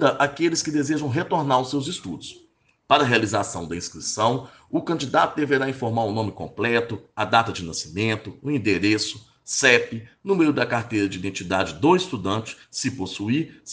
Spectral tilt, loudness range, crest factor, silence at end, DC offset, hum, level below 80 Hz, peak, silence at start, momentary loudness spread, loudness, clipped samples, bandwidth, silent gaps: -4.5 dB/octave; 3 LU; 22 dB; 0 s; under 0.1%; none; -58 dBFS; -2 dBFS; 0 s; 10 LU; -23 LUFS; under 0.1%; 10 kHz; none